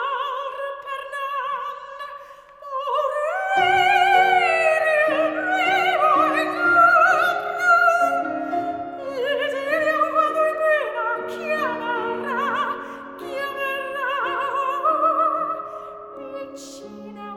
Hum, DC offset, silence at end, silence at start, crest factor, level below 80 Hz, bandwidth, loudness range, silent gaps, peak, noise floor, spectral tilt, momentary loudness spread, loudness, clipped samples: none; under 0.1%; 0 s; 0 s; 18 dB; -66 dBFS; 16.5 kHz; 8 LU; none; -4 dBFS; -42 dBFS; -3 dB/octave; 19 LU; -20 LUFS; under 0.1%